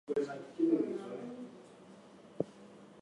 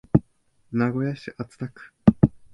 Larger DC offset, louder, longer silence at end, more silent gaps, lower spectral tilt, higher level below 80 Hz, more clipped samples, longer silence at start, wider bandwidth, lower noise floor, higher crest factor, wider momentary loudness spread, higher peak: neither; second, -37 LUFS vs -24 LUFS; second, 0 s vs 0.25 s; neither; second, -7.5 dB/octave vs -10 dB/octave; second, -80 dBFS vs -42 dBFS; neither; about the same, 0.1 s vs 0.15 s; first, 10.5 kHz vs 7.4 kHz; second, -56 dBFS vs -62 dBFS; about the same, 22 dB vs 24 dB; first, 24 LU vs 18 LU; second, -16 dBFS vs 0 dBFS